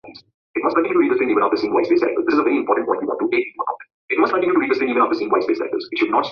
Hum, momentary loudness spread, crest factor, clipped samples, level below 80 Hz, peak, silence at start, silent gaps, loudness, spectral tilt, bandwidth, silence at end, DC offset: none; 7 LU; 16 dB; under 0.1%; -64 dBFS; -2 dBFS; 0.05 s; 0.34-0.54 s, 3.94-4.08 s; -19 LUFS; -6.5 dB/octave; 6.4 kHz; 0 s; under 0.1%